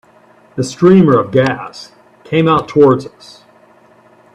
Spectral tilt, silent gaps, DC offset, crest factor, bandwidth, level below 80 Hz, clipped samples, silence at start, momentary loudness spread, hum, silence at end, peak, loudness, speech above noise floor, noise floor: -7 dB/octave; none; under 0.1%; 14 dB; 10 kHz; -50 dBFS; under 0.1%; 0.55 s; 21 LU; none; 1.25 s; 0 dBFS; -12 LUFS; 35 dB; -46 dBFS